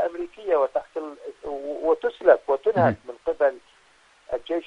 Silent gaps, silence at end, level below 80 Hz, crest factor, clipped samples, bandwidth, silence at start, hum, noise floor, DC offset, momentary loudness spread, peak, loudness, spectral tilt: none; 0.05 s; -60 dBFS; 22 dB; under 0.1%; 8.6 kHz; 0 s; none; -58 dBFS; under 0.1%; 15 LU; -4 dBFS; -24 LUFS; -7.5 dB/octave